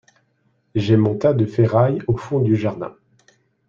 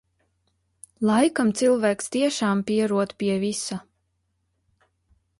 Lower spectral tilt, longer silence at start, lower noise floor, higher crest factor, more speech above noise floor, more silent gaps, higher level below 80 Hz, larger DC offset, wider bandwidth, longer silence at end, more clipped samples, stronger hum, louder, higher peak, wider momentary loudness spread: first, -9 dB/octave vs -5 dB/octave; second, 0.75 s vs 1 s; second, -65 dBFS vs -73 dBFS; about the same, 18 dB vs 18 dB; second, 47 dB vs 51 dB; neither; first, -50 dBFS vs -66 dBFS; neither; second, 7.2 kHz vs 11.5 kHz; second, 0.8 s vs 1.6 s; neither; neither; first, -19 LUFS vs -23 LUFS; first, -2 dBFS vs -8 dBFS; first, 10 LU vs 7 LU